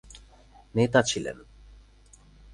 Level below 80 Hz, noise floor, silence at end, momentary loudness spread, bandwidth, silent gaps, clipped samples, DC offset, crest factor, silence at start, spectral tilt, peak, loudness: -54 dBFS; -55 dBFS; 1.15 s; 16 LU; 11.5 kHz; none; under 0.1%; under 0.1%; 24 dB; 0.1 s; -4.5 dB/octave; -6 dBFS; -26 LUFS